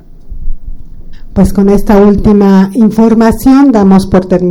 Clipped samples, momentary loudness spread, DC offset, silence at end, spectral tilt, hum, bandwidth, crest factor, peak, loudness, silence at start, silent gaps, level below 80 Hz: 2%; 10 LU; under 0.1%; 0 s; -8 dB/octave; none; 15.5 kHz; 6 dB; 0 dBFS; -6 LUFS; 0.25 s; none; -20 dBFS